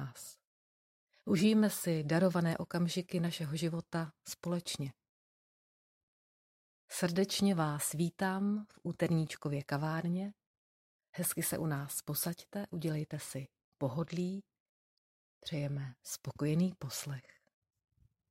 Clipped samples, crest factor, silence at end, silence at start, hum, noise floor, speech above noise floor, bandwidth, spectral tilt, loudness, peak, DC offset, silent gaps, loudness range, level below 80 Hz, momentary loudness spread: under 0.1%; 18 dB; 1.1 s; 0 s; none; under -90 dBFS; over 55 dB; 16 kHz; -5.5 dB/octave; -36 LUFS; -18 dBFS; under 0.1%; 0.47-1.07 s, 5.09-6.88 s, 10.46-10.99 s, 11.09-11.13 s, 13.64-13.72 s, 14.60-15.41 s; 8 LU; -70 dBFS; 13 LU